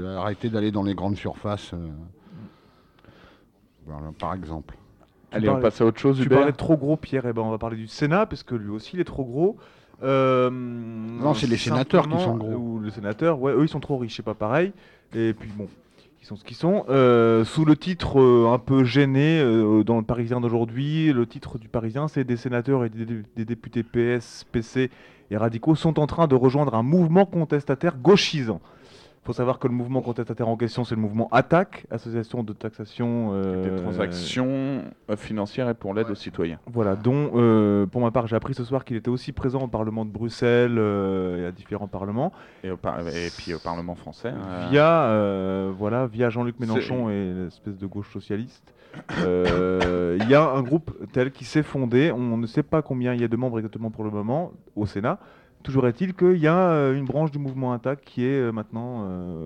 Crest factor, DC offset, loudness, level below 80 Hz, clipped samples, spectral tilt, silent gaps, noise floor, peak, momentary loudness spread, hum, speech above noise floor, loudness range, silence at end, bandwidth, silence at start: 18 dB; under 0.1%; -23 LUFS; -50 dBFS; under 0.1%; -7.5 dB/octave; none; -58 dBFS; -4 dBFS; 14 LU; none; 35 dB; 7 LU; 0 s; 10 kHz; 0 s